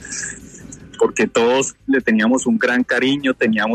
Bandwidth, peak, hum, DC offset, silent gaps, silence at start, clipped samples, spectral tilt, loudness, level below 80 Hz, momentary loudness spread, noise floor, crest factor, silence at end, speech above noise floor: 11 kHz; -4 dBFS; none; under 0.1%; none; 0 s; under 0.1%; -3.5 dB/octave; -17 LUFS; -52 dBFS; 17 LU; -38 dBFS; 14 dB; 0 s; 21 dB